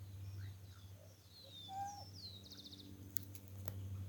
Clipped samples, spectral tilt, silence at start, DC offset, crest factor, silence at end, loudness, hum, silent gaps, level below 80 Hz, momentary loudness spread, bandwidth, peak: under 0.1%; -4 dB/octave; 0 s; under 0.1%; 36 dB; 0 s; -50 LUFS; none; none; -70 dBFS; 14 LU; 19 kHz; -14 dBFS